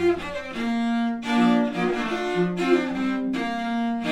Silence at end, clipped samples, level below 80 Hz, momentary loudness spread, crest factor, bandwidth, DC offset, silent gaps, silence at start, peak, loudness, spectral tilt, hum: 0 s; under 0.1%; -52 dBFS; 6 LU; 16 dB; 11 kHz; under 0.1%; none; 0 s; -8 dBFS; -24 LUFS; -6 dB/octave; none